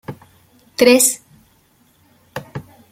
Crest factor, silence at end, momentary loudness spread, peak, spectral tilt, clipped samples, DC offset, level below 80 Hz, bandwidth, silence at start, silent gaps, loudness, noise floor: 20 dB; 0.3 s; 24 LU; 0 dBFS; -2.5 dB/octave; under 0.1%; under 0.1%; -58 dBFS; 16.5 kHz; 0.1 s; none; -13 LUFS; -56 dBFS